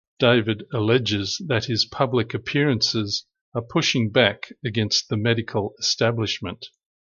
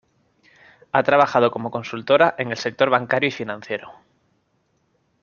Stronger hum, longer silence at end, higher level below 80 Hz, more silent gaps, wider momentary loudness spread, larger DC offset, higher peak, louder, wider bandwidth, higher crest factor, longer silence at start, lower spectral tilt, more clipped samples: neither; second, 0.45 s vs 1.3 s; first, -52 dBFS vs -66 dBFS; first, 3.41-3.52 s vs none; second, 9 LU vs 13 LU; neither; about the same, -4 dBFS vs -2 dBFS; about the same, -22 LUFS vs -20 LUFS; about the same, 7.4 kHz vs 7.2 kHz; about the same, 20 dB vs 20 dB; second, 0.2 s vs 0.95 s; about the same, -4.5 dB/octave vs -5.5 dB/octave; neither